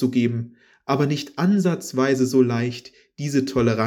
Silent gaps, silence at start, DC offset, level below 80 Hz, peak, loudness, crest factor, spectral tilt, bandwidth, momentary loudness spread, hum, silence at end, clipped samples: none; 0 s; under 0.1%; -54 dBFS; -6 dBFS; -22 LUFS; 16 dB; -6.5 dB/octave; 18.5 kHz; 13 LU; none; 0 s; under 0.1%